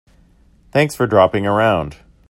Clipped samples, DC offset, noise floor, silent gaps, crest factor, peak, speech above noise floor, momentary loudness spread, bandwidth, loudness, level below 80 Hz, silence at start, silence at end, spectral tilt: under 0.1%; under 0.1%; -51 dBFS; none; 18 dB; 0 dBFS; 36 dB; 8 LU; 16 kHz; -16 LUFS; -46 dBFS; 0.75 s; 0.35 s; -6 dB/octave